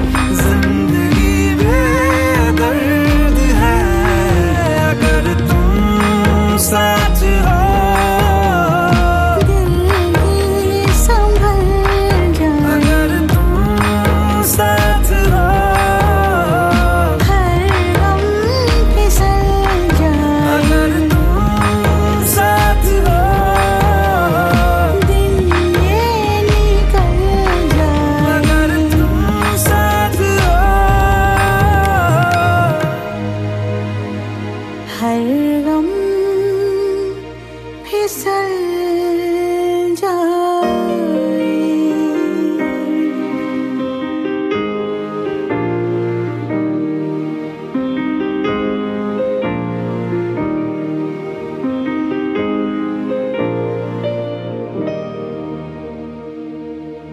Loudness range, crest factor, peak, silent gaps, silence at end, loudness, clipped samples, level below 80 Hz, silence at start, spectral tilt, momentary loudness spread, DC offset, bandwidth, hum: 7 LU; 12 dB; 0 dBFS; none; 0 s; -14 LUFS; under 0.1%; -18 dBFS; 0 s; -6 dB/octave; 9 LU; under 0.1%; 14 kHz; none